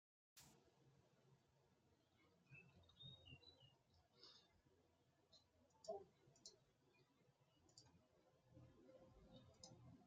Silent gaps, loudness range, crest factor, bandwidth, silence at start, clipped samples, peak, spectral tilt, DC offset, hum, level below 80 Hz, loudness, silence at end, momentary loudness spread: none; 4 LU; 26 dB; 7.4 kHz; 0.35 s; under 0.1%; -42 dBFS; -3.5 dB/octave; under 0.1%; none; -88 dBFS; -64 LUFS; 0 s; 12 LU